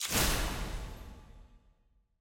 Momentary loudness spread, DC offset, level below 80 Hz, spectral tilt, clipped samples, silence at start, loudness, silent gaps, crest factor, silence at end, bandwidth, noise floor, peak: 23 LU; under 0.1%; -40 dBFS; -2.5 dB/octave; under 0.1%; 0 s; -33 LUFS; none; 20 dB; 0.6 s; 17 kHz; -70 dBFS; -16 dBFS